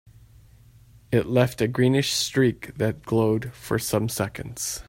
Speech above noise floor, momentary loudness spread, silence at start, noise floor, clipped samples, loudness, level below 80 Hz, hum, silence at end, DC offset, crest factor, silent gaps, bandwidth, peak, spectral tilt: 28 dB; 8 LU; 1.1 s; -52 dBFS; under 0.1%; -24 LUFS; -52 dBFS; none; 0.05 s; under 0.1%; 18 dB; none; 16.5 kHz; -6 dBFS; -5 dB/octave